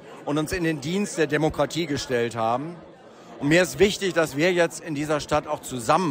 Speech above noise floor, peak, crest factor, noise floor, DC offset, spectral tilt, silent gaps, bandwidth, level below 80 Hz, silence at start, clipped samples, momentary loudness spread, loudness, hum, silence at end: 22 dB; -6 dBFS; 18 dB; -45 dBFS; under 0.1%; -4.5 dB/octave; none; 16 kHz; -50 dBFS; 0 s; under 0.1%; 8 LU; -24 LUFS; none; 0 s